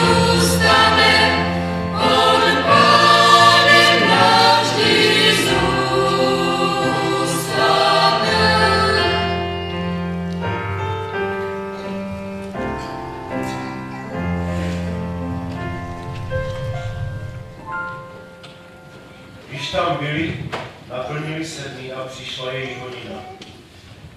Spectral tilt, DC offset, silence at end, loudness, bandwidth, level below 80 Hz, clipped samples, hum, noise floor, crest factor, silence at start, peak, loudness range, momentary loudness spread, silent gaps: -4 dB/octave; under 0.1%; 0 s; -16 LUFS; 16 kHz; -38 dBFS; under 0.1%; none; -42 dBFS; 18 dB; 0 s; 0 dBFS; 16 LU; 18 LU; none